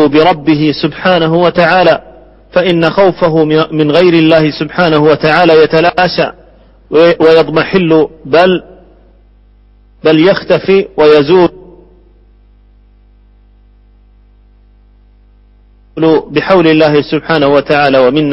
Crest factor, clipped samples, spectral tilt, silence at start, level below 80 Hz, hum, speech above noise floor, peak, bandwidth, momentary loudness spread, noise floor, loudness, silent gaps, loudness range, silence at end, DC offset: 10 dB; 0.3%; -8 dB/octave; 0 s; -42 dBFS; 50 Hz at -40 dBFS; 35 dB; 0 dBFS; 6 kHz; 6 LU; -43 dBFS; -8 LUFS; none; 5 LU; 0 s; under 0.1%